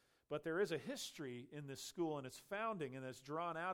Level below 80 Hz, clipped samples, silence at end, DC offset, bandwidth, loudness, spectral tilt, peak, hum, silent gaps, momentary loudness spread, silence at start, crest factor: -82 dBFS; under 0.1%; 0 s; under 0.1%; 17 kHz; -45 LUFS; -4.5 dB/octave; -28 dBFS; none; none; 9 LU; 0.3 s; 18 dB